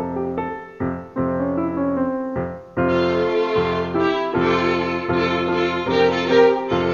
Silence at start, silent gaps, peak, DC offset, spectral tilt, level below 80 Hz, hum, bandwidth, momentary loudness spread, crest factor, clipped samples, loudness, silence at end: 0 s; none; -2 dBFS; under 0.1%; -7 dB/octave; -48 dBFS; none; 7.2 kHz; 10 LU; 18 dB; under 0.1%; -20 LUFS; 0 s